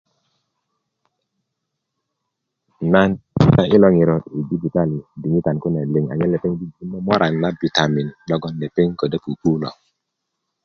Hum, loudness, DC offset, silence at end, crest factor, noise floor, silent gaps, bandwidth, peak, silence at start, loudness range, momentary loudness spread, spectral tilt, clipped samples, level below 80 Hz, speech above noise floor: none; -19 LUFS; under 0.1%; 0.95 s; 20 dB; -78 dBFS; none; 7 kHz; 0 dBFS; 2.8 s; 5 LU; 11 LU; -7.5 dB/octave; under 0.1%; -46 dBFS; 60 dB